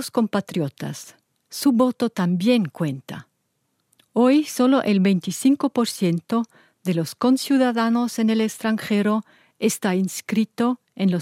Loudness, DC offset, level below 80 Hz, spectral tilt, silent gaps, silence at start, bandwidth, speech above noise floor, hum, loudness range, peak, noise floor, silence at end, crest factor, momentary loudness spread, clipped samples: -21 LUFS; under 0.1%; -72 dBFS; -5.5 dB/octave; none; 0 s; 16 kHz; 51 dB; none; 3 LU; -6 dBFS; -72 dBFS; 0 s; 16 dB; 9 LU; under 0.1%